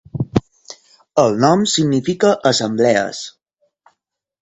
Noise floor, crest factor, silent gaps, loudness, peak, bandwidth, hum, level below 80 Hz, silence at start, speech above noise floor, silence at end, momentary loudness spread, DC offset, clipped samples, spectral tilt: -74 dBFS; 18 dB; none; -16 LUFS; 0 dBFS; 8.4 kHz; none; -48 dBFS; 0.15 s; 59 dB; 1.1 s; 9 LU; under 0.1%; under 0.1%; -4.5 dB/octave